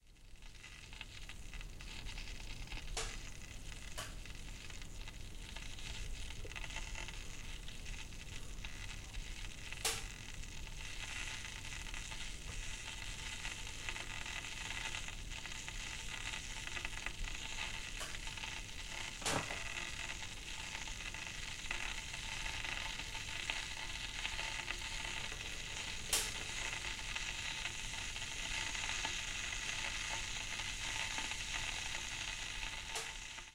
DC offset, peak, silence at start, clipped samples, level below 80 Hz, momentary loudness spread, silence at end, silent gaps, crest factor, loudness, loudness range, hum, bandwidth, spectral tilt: under 0.1%; -20 dBFS; 0.05 s; under 0.1%; -50 dBFS; 11 LU; 0 s; none; 24 dB; -43 LUFS; 8 LU; none; 16.5 kHz; -1 dB/octave